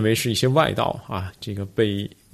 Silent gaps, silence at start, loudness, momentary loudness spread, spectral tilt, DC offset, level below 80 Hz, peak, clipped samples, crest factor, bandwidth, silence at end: none; 0 s; -23 LUFS; 12 LU; -5 dB/octave; under 0.1%; -52 dBFS; -4 dBFS; under 0.1%; 18 dB; 14 kHz; 0.25 s